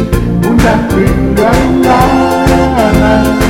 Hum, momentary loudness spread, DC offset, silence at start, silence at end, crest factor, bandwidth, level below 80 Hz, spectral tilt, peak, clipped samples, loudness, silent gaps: none; 3 LU; under 0.1%; 0 s; 0 s; 8 dB; 17 kHz; -18 dBFS; -6.5 dB/octave; 0 dBFS; 0.2%; -9 LUFS; none